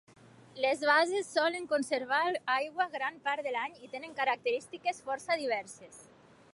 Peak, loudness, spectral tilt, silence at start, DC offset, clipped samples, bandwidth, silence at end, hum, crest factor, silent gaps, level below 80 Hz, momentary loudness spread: -14 dBFS; -32 LUFS; -2.5 dB/octave; 0.55 s; under 0.1%; under 0.1%; 11.5 kHz; 0.5 s; none; 20 dB; none; -80 dBFS; 12 LU